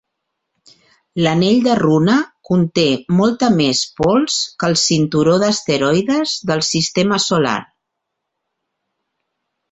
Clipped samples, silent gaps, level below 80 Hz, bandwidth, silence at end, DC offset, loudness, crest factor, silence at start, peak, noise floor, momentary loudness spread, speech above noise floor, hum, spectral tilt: under 0.1%; none; -52 dBFS; 8.4 kHz; 2.1 s; under 0.1%; -15 LUFS; 14 dB; 1.15 s; -2 dBFS; -77 dBFS; 4 LU; 62 dB; none; -4.5 dB/octave